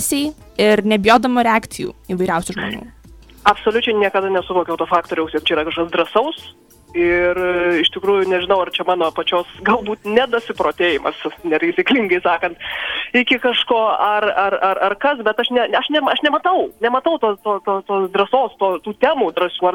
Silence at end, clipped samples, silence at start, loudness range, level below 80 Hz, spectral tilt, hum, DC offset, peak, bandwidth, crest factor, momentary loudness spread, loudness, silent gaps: 0 s; under 0.1%; 0 s; 2 LU; -48 dBFS; -4 dB/octave; none; under 0.1%; 0 dBFS; 18 kHz; 16 dB; 6 LU; -17 LUFS; none